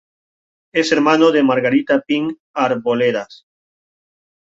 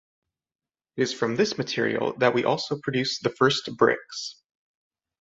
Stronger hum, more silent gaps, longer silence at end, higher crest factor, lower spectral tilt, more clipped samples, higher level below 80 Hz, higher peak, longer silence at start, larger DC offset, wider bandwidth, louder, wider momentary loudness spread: neither; first, 2.40-2.54 s vs none; first, 1.1 s vs 0.9 s; second, 16 dB vs 22 dB; about the same, -5 dB/octave vs -4.5 dB/octave; neither; about the same, -64 dBFS vs -66 dBFS; about the same, -2 dBFS vs -4 dBFS; second, 0.75 s vs 0.95 s; neither; about the same, 7.8 kHz vs 8 kHz; first, -16 LUFS vs -25 LUFS; about the same, 10 LU vs 10 LU